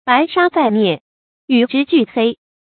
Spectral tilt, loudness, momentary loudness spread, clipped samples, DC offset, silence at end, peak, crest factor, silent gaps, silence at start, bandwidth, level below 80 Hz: -10.5 dB/octave; -15 LUFS; 5 LU; under 0.1%; under 0.1%; 0.3 s; 0 dBFS; 16 dB; 1.01-1.48 s; 0.05 s; 4.6 kHz; -64 dBFS